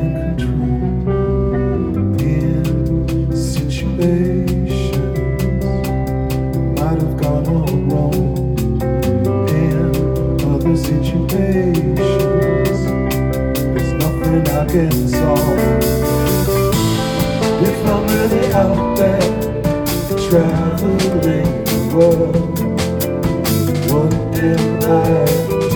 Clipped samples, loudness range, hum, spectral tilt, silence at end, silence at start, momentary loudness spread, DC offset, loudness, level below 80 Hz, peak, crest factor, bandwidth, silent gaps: under 0.1%; 2 LU; none; -7 dB/octave; 0 s; 0 s; 4 LU; under 0.1%; -16 LUFS; -26 dBFS; 0 dBFS; 14 dB; over 20 kHz; none